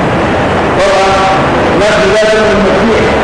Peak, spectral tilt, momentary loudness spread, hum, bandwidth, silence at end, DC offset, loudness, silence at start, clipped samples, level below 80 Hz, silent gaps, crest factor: -4 dBFS; -5 dB/octave; 3 LU; none; 10.5 kHz; 0 s; under 0.1%; -8 LUFS; 0 s; under 0.1%; -26 dBFS; none; 4 dB